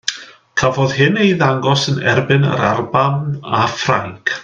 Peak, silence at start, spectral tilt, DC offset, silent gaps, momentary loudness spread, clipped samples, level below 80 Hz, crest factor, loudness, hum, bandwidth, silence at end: 0 dBFS; 0.05 s; -5.5 dB/octave; under 0.1%; none; 8 LU; under 0.1%; -50 dBFS; 16 dB; -15 LUFS; none; 7.6 kHz; 0 s